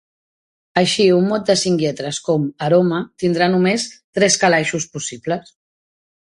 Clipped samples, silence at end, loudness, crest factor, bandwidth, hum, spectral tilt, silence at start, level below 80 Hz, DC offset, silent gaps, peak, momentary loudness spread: under 0.1%; 1 s; -17 LUFS; 18 dB; 11.5 kHz; none; -4 dB/octave; 0.75 s; -58 dBFS; under 0.1%; 4.04-4.13 s; 0 dBFS; 11 LU